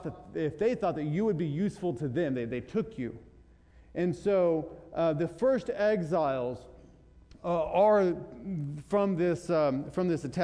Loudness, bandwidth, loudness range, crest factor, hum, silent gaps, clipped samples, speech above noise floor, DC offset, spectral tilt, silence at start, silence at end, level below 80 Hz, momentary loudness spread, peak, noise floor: -30 LUFS; 10.5 kHz; 4 LU; 16 dB; none; none; under 0.1%; 28 dB; under 0.1%; -8 dB/octave; 0 s; 0 s; -58 dBFS; 12 LU; -14 dBFS; -57 dBFS